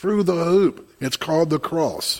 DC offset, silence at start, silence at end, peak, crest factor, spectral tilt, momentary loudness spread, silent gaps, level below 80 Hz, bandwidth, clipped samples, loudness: under 0.1%; 0 s; 0 s; -6 dBFS; 14 dB; -5 dB/octave; 8 LU; none; -58 dBFS; 16.5 kHz; under 0.1%; -21 LUFS